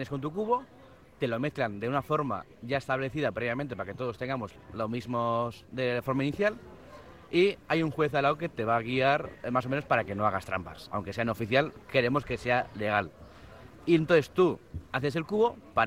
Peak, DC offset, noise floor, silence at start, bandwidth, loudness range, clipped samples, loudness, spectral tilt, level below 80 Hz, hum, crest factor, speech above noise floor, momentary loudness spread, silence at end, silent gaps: -10 dBFS; under 0.1%; -50 dBFS; 0 s; 16 kHz; 4 LU; under 0.1%; -30 LUFS; -7 dB/octave; -58 dBFS; none; 20 dB; 21 dB; 10 LU; 0 s; none